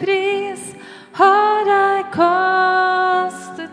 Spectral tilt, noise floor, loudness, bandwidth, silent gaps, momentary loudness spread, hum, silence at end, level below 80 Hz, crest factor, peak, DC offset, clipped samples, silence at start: -4 dB/octave; -37 dBFS; -16 LUFS; 10.5 kHz; none; 16 LU; none; 0 s; -70 dBFS; 16 dB; -2 dBFS; under 0.1%; under 0.1%; 0 s